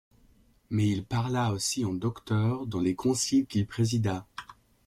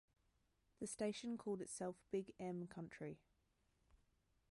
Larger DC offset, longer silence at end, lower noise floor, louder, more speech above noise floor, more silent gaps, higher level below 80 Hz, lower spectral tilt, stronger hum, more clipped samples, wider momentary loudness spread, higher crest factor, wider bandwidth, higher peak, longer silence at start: neither; second, 0.35 s vs 0.55 s; second, -62 dBFS vs -82 dBFS; first, -29 LUFS vs -49 LUFS; about the same, 34 dB vs 34 dB; neither; first, -58 dBFS vs -80 dBFS; about the same, -5.5 dB/octave vs -5 dB/octave; neither; neither; about the same, 7 LU vs 8 LU; about the same, 14 dB vs 18 dB; first, 15 kHz vs 11.5 kHz; first, -16 dBFS vs -32 dBFS; about the same, 0.7 s vs 0.8 s